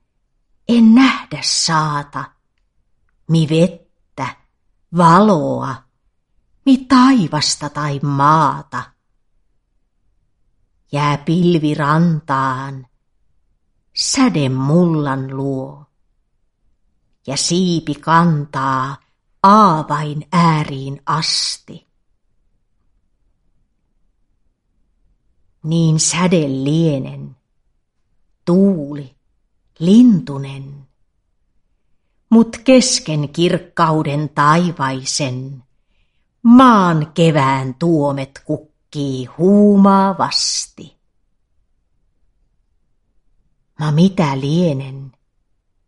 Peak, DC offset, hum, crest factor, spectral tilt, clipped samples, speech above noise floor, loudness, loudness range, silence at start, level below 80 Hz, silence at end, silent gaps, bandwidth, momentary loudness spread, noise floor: 0 dBFS; under 0.1%; none; 16 dB; -5.5 dB/octave; under 0.1%; 51 dB; -15 LUFS; 7 LU; 0.7 s; -52 dBFS; 0.8 s; none; 11.5 kHz; 17 LU; -65 dBFS